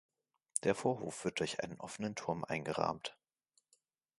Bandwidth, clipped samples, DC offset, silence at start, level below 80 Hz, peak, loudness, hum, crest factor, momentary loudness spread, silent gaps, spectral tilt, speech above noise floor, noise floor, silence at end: 11.5 kHz; under 0.1%; under 0.1%; 0.55 s; -70 dBFS; -12 dBFS; -39 LUFS; none; 28 dB; 8 LU; none; -4 dB/octave; 41 dB; -79 dBFS; 1.05 s